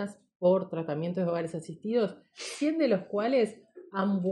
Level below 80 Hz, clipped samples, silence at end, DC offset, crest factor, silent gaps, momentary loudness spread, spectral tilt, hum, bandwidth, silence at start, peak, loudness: -78 dBFS; under 0.1%; 0 s; under 0.1%; 16 dB; 0.35-0.40 s; 11 LU; -6.5 dB/octave; none; 11.5 kHz; 0 s; -14 dBFS; -30 LUFS